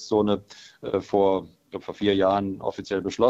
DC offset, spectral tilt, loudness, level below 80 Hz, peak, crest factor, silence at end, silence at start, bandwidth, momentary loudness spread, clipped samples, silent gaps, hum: under 0.1%; -6 dB/octave; -25 LUFS; -58 dBFS; -6 dBFS; 18 dB; 0 s; 0 s; 8 kHz; 15 LU; under 0.1%; none; none